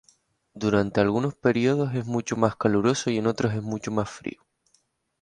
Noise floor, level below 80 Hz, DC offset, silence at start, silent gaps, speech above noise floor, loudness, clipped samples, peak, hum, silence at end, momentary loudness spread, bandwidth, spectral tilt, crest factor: -69 dBFS; -56 dBFS; under 0.1%; 0.55 s; none; 44 dB; -25 LUFS; under 0.1%; -4 dBFS; none; 0.9 s; 8 LU; 10.5 kHz; -6 dB/octave; 22 dB